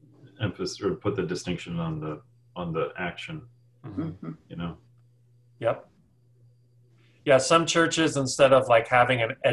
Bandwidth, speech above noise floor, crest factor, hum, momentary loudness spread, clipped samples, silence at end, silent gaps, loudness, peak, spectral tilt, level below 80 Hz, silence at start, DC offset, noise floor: 12 kHz; 36 dB; 22 dB; none; 18 LU; under 0.1%; 0 s; none; -25 LUFS; -4 dBFS; -4.5 dB/octave; -56 dBFS; 0.25 s; under 0.1%; -61 dBFS